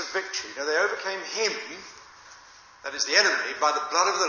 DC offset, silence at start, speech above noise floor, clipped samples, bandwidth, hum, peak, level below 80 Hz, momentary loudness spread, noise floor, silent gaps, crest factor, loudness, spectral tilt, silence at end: under 0.1%; 0 s; 25 dB; under 0.1%; 7.2 kHz; none; -4 dBFS; -72 dBFS; 18 LU; -51 dBFS; none; 22 dB; -25 LUFS; 0.5 dB/octave; 0 s